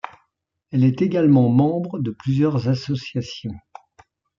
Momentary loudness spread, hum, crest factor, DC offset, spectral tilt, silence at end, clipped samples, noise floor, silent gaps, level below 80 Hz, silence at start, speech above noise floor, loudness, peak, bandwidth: 17 LU; none; 16 dB; under 0.1%; -8.5 dB/octave; 0.8 s; under 0.1%; -72 dBFS; none; -60 dBFS; 0.05 s; 53 dB; -20 LUFS; -6 dBFS; 7.2 kHz